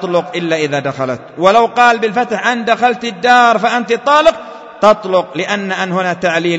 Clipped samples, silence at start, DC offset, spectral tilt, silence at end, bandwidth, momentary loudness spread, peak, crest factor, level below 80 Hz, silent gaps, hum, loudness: 0.3%; 0 s; under 0.1%; -4.5 dB/octave; 0 s; 9 kHz; 8 LU; 0 dBFS; 12 dB; -52 dBFS; none; none; -13 LUFS